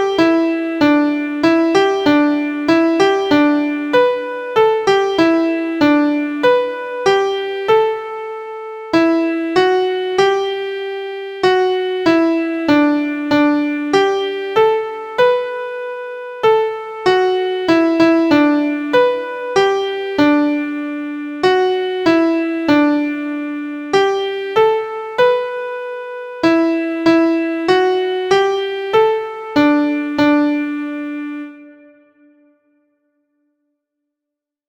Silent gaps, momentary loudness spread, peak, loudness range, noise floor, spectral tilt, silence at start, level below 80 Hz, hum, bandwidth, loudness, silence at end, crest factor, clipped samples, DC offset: none; 10 LU; 0 dBFS; 3 LU; -83 dBFS; -5 dB/octave; 0 s; -56 dBFS; none; 9 kHz; -16 LUFS; 2.95 s; 16 dB; under 0.1%; under 0.1%